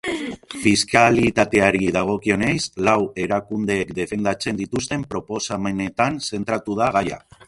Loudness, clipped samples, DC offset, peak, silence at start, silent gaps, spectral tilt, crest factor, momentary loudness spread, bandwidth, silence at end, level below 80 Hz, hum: -20 LUFS; under 0.1%; under 0.1%; 0 dBFS; 0.05 s; none; -4.5 dB/octave; 20 dB; 10 LU; 11.5 kHz; 0.3 s; -48 dBFS; none